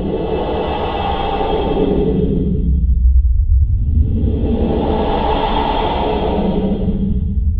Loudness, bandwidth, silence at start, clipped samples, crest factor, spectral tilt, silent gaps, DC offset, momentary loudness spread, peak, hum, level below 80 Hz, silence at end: -17 LUFS; 4.6 kHz; 0 s; under 0.1%; 12 dB; -10.5 dB/octave; none; under 0.1%; 4 LU; -2 dBFS; none; -18 dBFS; 0 s